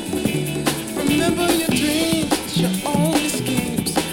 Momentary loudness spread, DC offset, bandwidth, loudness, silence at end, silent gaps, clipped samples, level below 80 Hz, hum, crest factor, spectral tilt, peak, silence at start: 4 LU; under 0.1%; 17 kHz; -20 LUFS; 0 s; none; under 0.1%; -46 dBFS; none; 16 dB; -4 dB/octave; -4 dBFS; 0 s